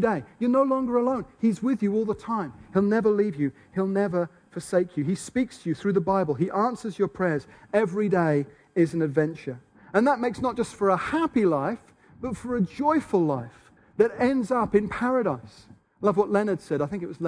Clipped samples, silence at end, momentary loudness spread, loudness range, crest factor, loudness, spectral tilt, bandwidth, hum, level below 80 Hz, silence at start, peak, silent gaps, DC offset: under 0.1%; 0 s; 8 LU; 1 LU; 18 dB; -25 LUFS; -7.5 dB/octave; 10.5 kHz; none; -58 dBFS; 0 s; -6 dBFS; none; under 0.1%